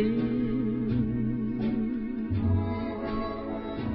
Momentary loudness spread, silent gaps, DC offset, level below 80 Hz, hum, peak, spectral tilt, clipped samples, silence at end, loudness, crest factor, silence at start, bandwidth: 6 LU; none; under 0.1%; -44 dBFS; none; -16 dBFS; -12 dB/octave; under 0.1%; 0 s; -30 LUFS; 12 dB; 0 s; 5.2 kHz